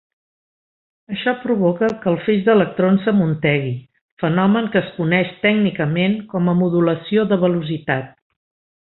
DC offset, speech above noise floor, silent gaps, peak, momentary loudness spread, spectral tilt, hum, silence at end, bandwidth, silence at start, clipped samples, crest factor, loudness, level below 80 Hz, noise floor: under 0.1%; over 73 dB; 4.01-4.17 s; -2 dBFS; 7 LU; -9.5 dB/octave; none; 0.7 s; 4.2 kHz; 1.1 s; under 0.1%; 16 dB; -18 LUFS; -58 dBFS; under -90 dBFS